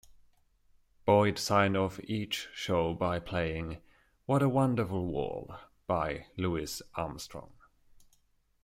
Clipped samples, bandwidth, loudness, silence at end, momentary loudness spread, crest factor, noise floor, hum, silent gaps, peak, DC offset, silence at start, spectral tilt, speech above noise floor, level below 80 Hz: under 0.1%; 16 kHz; -31 LUFS; 1.2 s; 16 LU; 20 dB; -70 dBFS; none; none; -12 dBFS; under 0.1%; 0.1 s; -5.5 dB/octave; 39 dB; -56 dBFS